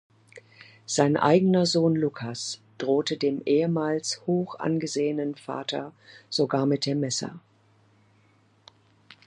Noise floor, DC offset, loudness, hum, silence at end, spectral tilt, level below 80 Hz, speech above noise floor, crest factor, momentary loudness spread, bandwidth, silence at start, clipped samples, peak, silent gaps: -62 dBFS; under 0.1%; -26 LUFS; none; 1.9 s; -5 dB/octave; -74 dBFS; 37 dB; 20 dB; 12 LU; 11.5 kHz; 0.35 s; under 0.1%; -6 dBFS; none